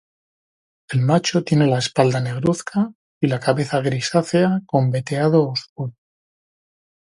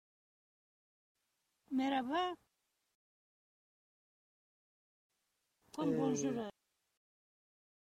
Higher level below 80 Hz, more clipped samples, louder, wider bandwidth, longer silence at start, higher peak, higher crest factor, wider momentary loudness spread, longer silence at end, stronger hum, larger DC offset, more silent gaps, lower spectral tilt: first, -58 dBFS vs -82 dBFS; neither; first, -20 LUFS vs -38 LUFS; about the same, 11.5 kHz vs 12.5 kHz; second, 0.9 s vs 1.7 s; first, 0 dBFS vs -24 dBFS; about the same, 20 dB vs 20 dB; second, 8 LU vs 14 LU; second, 1.3 s vs 1.45 s; neither; neither; second, 2.95-3.21 s, 5.69-5.76 s vs 2.95-5.10 s; about the same, -6 dB/octave vs -5 dB/octave